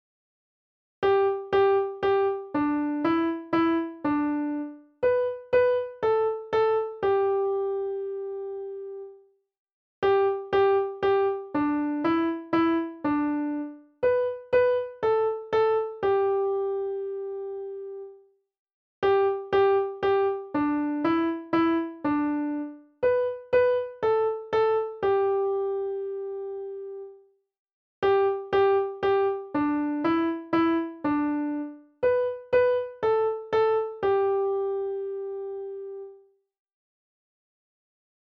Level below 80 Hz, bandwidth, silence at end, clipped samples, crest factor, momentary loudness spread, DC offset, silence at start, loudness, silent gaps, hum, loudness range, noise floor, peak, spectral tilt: -62 dBFS; 5.6 kHz; 2.15 s; under 0.1%; 14 dB; 12 LU; under 0.1%; 1 s; -26 LUFS; 9.59-9.66 s, 9.72-10.02 s, 18.59-18.66 s, 18.73-19.02 s, 27.59-27.65 s, 27.73-28.02 s; none; 4 LU; -55 dBFS; -12 dBFS; -7.5 dB/octave